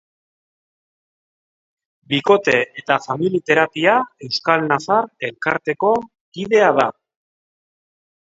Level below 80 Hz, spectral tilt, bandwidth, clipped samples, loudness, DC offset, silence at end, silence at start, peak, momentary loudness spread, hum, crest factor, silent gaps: -64 dBFS; -5 dB/octave; 7.8 kHz; under 0.1%; -18 LUFS; under 0.1%; 1.45 s; 2.1 s; 0 dBFS; 8 LU; none; 20 dB; 6.21-6.32 s